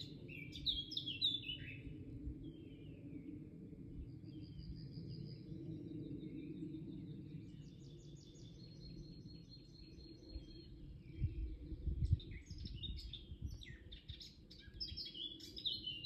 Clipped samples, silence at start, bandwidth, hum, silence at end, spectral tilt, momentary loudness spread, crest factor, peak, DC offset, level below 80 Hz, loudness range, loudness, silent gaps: under 0.1%; 0 s; 13.5 kHz; none; 0 s; -5.5 dB/octave; 16 LU; 26 dB; -22 dBFS; under 0.1%; -54 dBFS; 11 LU; -47 LUFS; none